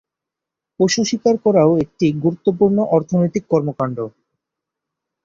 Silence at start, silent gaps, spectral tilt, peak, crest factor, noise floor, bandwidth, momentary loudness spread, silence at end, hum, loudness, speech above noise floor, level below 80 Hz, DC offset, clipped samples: 0.8 s; none; -6 dB/octave; -2 dBFS; 16 dB; -85 dBFS; 7.6 kHz; 9 LU; 1.15 s; none; -17 LUFS; 68 dB; -56 dBFS; under 0.1%; under 0.1%